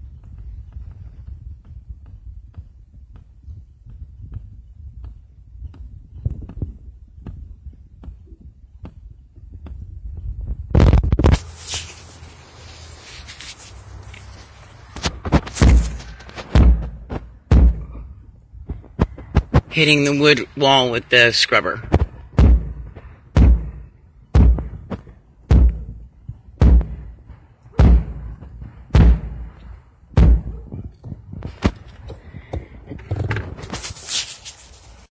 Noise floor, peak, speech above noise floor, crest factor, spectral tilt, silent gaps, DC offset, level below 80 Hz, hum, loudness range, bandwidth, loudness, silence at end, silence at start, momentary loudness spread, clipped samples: -46 dBFS; 0 dBFS; 31 dB; 20 dB; -5.5 dB/octave; none; under 0.1%; -22 dBFS; none; 24 LU; 8 kHz; -18 LUFS; 0.6 s; 0.05 s; 25 LU; under 0.1%